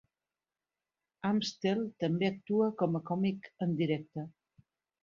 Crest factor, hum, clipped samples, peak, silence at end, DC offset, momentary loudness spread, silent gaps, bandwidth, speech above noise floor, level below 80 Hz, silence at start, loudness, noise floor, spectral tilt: 18 dB; none; under 0.1%; -16 dBFS; 0.7 s; under 0.1%; 7 LU; none; 7.4 kHz; over 58 dB; -74 dBFS; 1.25 s; -33 LUFS; under -90 dBFS; -7 dB/octave